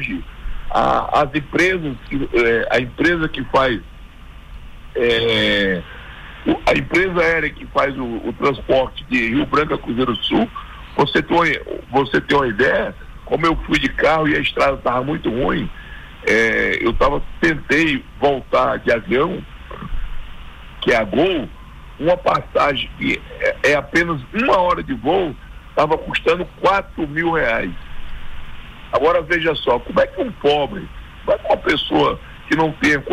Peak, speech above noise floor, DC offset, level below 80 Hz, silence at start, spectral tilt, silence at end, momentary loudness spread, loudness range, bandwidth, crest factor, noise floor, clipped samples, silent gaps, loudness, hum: -4 dBFS; 20 dB; under 0.1%; -34 dBFS; 0 s; -5.5 dB/octave; 0 s; 15 LU; 2 LU; 16 kHz; 14 dB; -37 dBFS; under 0.1%; none; -18 LUFS; none